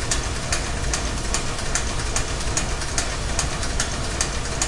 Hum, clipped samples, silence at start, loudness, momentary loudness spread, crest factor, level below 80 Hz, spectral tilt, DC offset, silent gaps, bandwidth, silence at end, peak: none; under 0.1%; 0 s; -24 LUFS; 1 LU; 18 dB; -28 dBFS; -2.5 dB/octave; under 0.1%; none; 11.5 kHz; 0 s; -4 dBFS